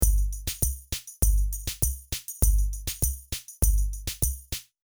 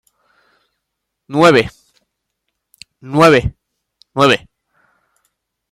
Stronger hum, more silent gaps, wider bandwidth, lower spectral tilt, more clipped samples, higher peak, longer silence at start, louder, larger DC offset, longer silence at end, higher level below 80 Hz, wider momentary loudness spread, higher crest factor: neither; neither; first, over 20 kHz vs 15.5 kHz; second, -3.5 dB/octave vs -5.5 dB/octave; neither; second, -6 dBFS vs 0 dBFS; second, 0 s vs 1.3 s; second, -28 LUFS vs -13 LUFS; first, 0.2% vs under 0.1%; second, 0.2 s vs 1.35 s; first, -28 dBFS vs -42 dBFS; second, 9 LU vs 16 LU; about the same, 20 dB vs 18 dB